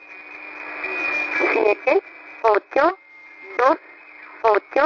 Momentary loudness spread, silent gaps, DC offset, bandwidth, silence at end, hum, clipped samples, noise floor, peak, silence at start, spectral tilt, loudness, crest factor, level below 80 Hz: 19 LU; none; under 0.1%; 6 kHz; 0 s; none; under 0.1%; -43 dBFS; -4 dBFS; 0.1 s; -4.5 dB/octave; -20 LUFS; 18 dB; -64 dBFS